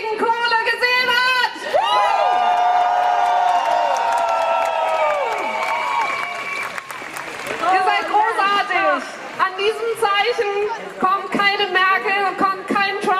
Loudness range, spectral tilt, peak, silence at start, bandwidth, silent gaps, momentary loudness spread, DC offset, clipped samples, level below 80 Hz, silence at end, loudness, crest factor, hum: 4 LU; -2 dB/octave; -4 dBFS; 0 s; 15.5 kHz; none; 8 LU; under 0.1%; under 0.1%; -66 dBFS; 0 s; -18 LUFS; 16 dB; none